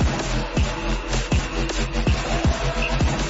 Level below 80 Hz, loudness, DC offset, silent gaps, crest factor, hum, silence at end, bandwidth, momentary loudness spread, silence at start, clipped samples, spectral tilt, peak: -26 dBFS; -23 LUFS; under 0.1%; none; 10 dB; none; 0 s; 8 kHz; 3 LU; 0 s; under 0.1%; -5 dB/octave; -12 dBFS